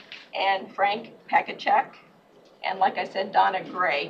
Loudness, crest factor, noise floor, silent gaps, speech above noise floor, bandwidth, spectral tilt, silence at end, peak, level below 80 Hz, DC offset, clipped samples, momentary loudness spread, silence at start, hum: -25 LUFS; 18 dB; -55 dBFS; none; 30 dB; 7.2 kHz; -4.5 dB/octave; 0 s; -8 dBFS; -80 dBFS; under 0.1%; under 0.1%; 10 LU; 0.1 s; none